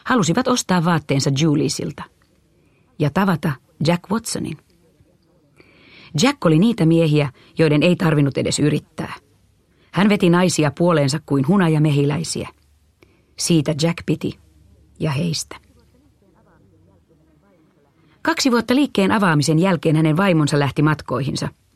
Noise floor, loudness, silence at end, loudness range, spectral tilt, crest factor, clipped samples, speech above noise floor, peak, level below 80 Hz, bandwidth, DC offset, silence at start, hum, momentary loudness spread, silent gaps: -58 dBFS; -18 LUFS; 0.25 s; 8 LU; -5.5 dB/octave; 18 dB; under 0.1%; 40 dB; -2 dBFS; -54 dBFS; 14.5 kHz; under 0.1%; 0.05 s; none; 11 LU; none